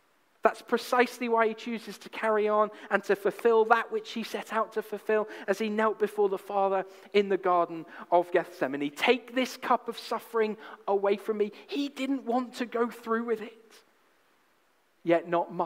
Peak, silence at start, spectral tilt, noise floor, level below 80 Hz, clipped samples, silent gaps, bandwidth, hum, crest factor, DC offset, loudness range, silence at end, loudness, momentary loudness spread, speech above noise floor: -6 dBFS; 0.45 s; -5 dB/octave; -69 dBFS; -84 dBFS; under 0.1%; none; 16 kHz; none; 22 dB; under 0.1%; 5 LU; 0 s; -29 LUFS; 8 LU; 40 dB